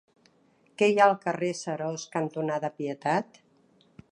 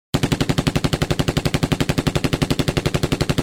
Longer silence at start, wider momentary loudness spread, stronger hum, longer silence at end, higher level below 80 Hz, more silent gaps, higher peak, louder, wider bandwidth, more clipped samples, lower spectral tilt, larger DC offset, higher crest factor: first, 0.8 s vs 0.15 s; first, 11 LU vs 1 LU; neither; first, 0.9 s vs 0 s; second, -76 dBFS vs -32 dBFS; neither; about the same, -6 dBFS vs -4 dBFS; second, -27 LUFS vs -20 LUFS; second, 11 kHz vs 19 kHz; neither; about the same, -5 dB/octave vs -5.5 dB/octave; neither; first, 22 dB vs 16 dB